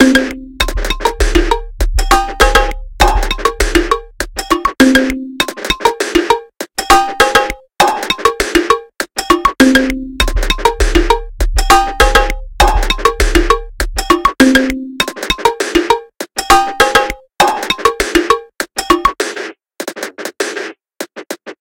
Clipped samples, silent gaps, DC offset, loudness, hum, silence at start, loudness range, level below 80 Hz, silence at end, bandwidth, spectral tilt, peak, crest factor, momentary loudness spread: 0.5%; none; under 0.1%; -13 LUFS; none; 0 s; 2 LU; -20 dBFS; 0.1 s; 17.5 kHz; -3.5 dB/octave; 0 dBFS; 12 dB; 12 LU